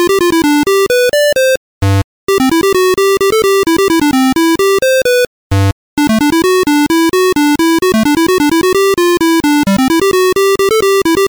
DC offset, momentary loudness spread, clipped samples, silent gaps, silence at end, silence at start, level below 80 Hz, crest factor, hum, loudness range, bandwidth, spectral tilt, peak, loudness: under 0.1%; 4 LU; under 0.1%; 1.57-1.81 s, 2.04-2.27 s, 5.27-5.50 s, 5.72-5.97 s; 0 s; 0 s; -36 dBFS; 2 dB; none; 1 LU; over 20 kHz; -4.5 dB/octave; -8 dBFS; -10 LUFS